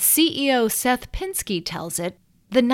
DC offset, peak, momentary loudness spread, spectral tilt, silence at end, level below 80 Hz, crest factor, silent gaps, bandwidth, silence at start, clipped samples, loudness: under 0.1%; -2 dBFS; 10 LU; -2.5 dB/octave; 0 s; -42 dBFS; 18 dB; none; 17 kHz; 0 s; under 0.1%; -22 LUFS